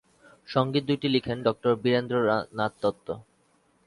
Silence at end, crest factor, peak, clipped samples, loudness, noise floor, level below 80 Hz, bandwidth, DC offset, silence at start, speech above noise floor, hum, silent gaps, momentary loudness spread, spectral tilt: 0.65 s; 20 dB; -8 dBFS; under 0.1%; -26 LUFS; -66 dBFS; -62 dBFS; 11.5 kHz; under 0.1%; 0.5 s; 40 dB; none; none; 7 LU; -7.5 dB/octave